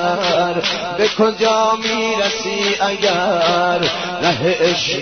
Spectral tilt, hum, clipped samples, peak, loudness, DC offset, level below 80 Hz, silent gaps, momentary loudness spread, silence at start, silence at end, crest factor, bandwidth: -3.5 dB/octave; none; under 0.1%; -2 dBFS; -16 LUFS; 0.2%; -54 dBFS; none; 3 LU; 0 s; 0 s; 14 dB; 6.6 kHz